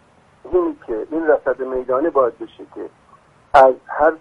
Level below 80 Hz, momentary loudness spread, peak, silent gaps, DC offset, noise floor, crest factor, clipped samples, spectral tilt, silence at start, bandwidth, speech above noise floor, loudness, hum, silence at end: -48 dBFS; 22 LU; 0 dBFS; none; under 0.1%; -51 dBFS; 18 dB; under 0.1%; -6.5 dB/octave; 0.45 s; 10 kHz; 34 dB; -17 LUFS; none; 0.05 s